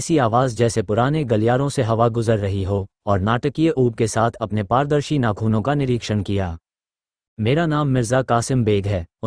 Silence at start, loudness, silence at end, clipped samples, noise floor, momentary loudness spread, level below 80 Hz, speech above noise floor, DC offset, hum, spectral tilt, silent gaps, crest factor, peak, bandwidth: 0 s; -20 LUFS; 0 s; under 0.1%; under -90 dBFS; 6 LU; -44 dBFS; over 71 dB; under 0.1%; none; -6.5 dB/octave; 7.28-7.37 s; 16 dB; -2 dBFS; 10.5 kHz